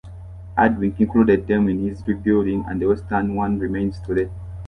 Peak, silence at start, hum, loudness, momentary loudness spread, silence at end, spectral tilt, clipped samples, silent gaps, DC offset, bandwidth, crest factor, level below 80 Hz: -4 dBFS; 0.05 s; none; -21 LUFS; 8 LU; 0 s; -9.5 dB/octave; under 0.1%; none; under 0.1%; 5.8 kHz; 16 dB; -38 dBFS